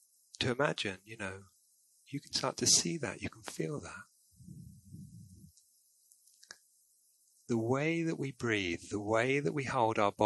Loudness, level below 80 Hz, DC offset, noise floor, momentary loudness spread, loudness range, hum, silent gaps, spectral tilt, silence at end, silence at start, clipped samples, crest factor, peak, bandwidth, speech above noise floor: -33 LUFS; -64 dBFS; under 0.1%; -70 dBFS; 24 LU; 14 LU; none; none; -3.5 dB/octave; 0 s; 0.4 s; under 0.1%; 24 dB; -12 dBFS; 12 kHz; 36 dB